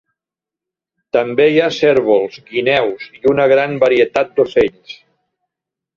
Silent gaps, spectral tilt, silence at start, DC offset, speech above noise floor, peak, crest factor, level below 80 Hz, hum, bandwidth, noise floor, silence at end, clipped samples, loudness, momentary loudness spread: none; -6 dB/octave; 1.15 s; under 0.1%; 73 dB; -2 dBFS; 14 dB; -54 dBFS; none; 7.4 kHz; -87 dBFS; 1.05 s; under 0.1%; -14 LUFS; 7 LU